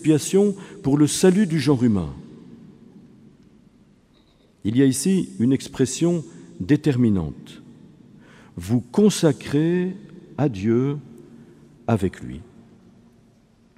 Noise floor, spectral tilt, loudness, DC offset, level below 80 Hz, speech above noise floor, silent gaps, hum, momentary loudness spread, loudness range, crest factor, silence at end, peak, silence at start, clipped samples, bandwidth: -56 dBFS; -6 dB/octave; -21 LUFS; under 0.1%; -52 dBFS; 36 dB; none; none; 20 LU; 5 LU; 18 dB; 1.35 s; -4 dBFS; 0 s; under 0.1%; 15.5 kHz